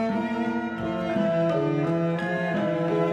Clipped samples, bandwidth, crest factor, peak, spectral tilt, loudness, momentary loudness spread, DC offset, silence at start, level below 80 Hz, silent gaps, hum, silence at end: under 0.1%; 8.8 kHz; 12 dB; -12 dBFS; -8 dB/octave; -26 LUFS; 5 LU; under 0.1%; 0 s; -58 dBFS; none; none; 0 s